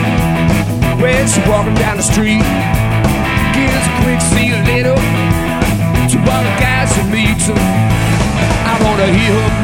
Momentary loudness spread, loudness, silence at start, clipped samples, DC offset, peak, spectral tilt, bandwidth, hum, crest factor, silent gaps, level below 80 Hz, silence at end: 2 LU; -12 LUFS; 0 s; under 0.1%; under 0.1%; 0 dBFS; -5 dB/octave; 17 kHz; none; 12 dB; none; -22 dBFS; 0 s